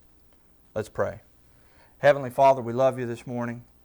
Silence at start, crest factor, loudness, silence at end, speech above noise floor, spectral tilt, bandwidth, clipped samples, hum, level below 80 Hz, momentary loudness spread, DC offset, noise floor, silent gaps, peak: 0.75 s; 18 dB; -25 LUFS; 0.25 s; 34 dB; -6.5 dB/octave; over 20 kHz; under 0.1%; 60 Hz at -60 dBFS; -60 dBFS; 14 LU; under 0.1%; -58 dBFS; none; -8 dBFS